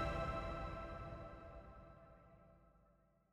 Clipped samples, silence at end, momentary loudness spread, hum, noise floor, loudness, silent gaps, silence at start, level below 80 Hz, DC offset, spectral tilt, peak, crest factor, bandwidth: under 0.1%; 0.4 s; 22 LU; none; -74 dBFS; -48 LUFS; none; 0 s; -54 dBFS; under 0.1%; -7 dB/octave; -30 dBFS; 18 dB; 11.5 kHz